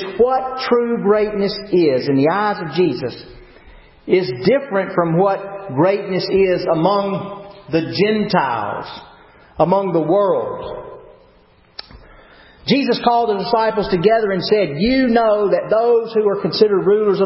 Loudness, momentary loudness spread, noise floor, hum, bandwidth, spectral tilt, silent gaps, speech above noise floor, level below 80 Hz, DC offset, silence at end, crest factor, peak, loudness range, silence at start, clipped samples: -17 LUFS; 13 LU; -51 dBFS; none; 5.8 kHz; -10.5 dB/octave; none; 35 dB; -48 dBFS; under 0.1%; 0 s; 16 dB; 0 dBFS; 5 LU; 0 s; under 0.1%